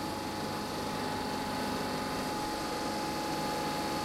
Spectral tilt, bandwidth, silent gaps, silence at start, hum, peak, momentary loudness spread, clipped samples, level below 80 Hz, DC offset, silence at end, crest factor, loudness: -4 dB/octave; 16.5 kHz; none; 0 s; none; -22 dBFS; 2 LU; under 0.1%; -56 dBFS; under 0.1%; 0 s; 12 dB; -34 LUFS